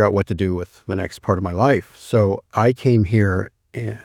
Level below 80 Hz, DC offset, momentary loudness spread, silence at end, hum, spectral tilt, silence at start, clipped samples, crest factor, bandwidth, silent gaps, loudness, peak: -44 dBFS; under 0.1%; 11 LU; 0.05 s; none; -8 dB/octave; 0 s; under 0.1%; 18 dB; 13 kHz; none; -20 LUFS; -2 dBFS